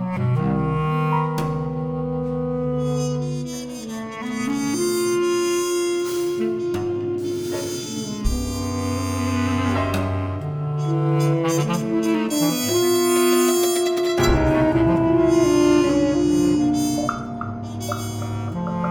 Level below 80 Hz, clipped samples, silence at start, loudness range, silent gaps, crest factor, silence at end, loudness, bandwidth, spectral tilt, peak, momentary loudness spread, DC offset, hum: -36 dBFS; under 0.1%; 0 s; 7 LU; none; 14 dB; 0 s; -21 LUFS; over 20 kHz; -5.5 dB/octave; -6 dBFS; 10 LU; under 0.1%; none